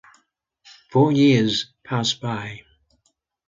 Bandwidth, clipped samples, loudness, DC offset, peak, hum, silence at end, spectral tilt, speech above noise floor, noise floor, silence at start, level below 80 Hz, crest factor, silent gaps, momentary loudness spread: 7.6 kHz; under 0.1%; -20 LUFS; under 0.1%; -6 dBFS; none; 0.9 s; -5.5 dB/octave; 50 dB; -70 dBFS; 0.95 s; -60 dBFS; 16 dB; none; 15 LU